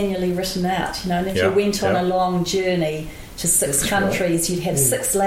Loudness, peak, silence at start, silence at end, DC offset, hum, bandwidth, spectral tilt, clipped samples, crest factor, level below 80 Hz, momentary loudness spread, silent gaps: -20 LUFS; -6 dBFS; 0 s; 0 s; under 0.1%; none; 16.5 kHz; -4 dB/octave; under 0.1%; 14 dB; -40 dBFS; 6 LU; none